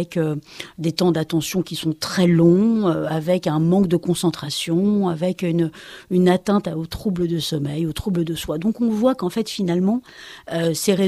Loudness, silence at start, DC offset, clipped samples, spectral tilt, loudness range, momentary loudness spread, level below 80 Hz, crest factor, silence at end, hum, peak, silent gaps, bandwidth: -20 LUFS; 0 s; under 0.1%; under 0.1%; -6 dB/octave; 4 LU; 8 LU; -48 dBFS; 16 dB; 0 s; none; -4 dBFS; none; 15 kHz